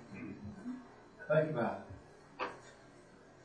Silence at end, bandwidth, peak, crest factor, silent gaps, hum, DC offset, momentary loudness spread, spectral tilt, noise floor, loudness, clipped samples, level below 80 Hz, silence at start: 0 s; 9.8 kHz; -18 dBFS; 22 dB; none; none; under 0.1%; 25 LU; -7.5 dB/octave; -59 dBFS; -39 LUFS; under 0.1%; -70 dBFS; 0 s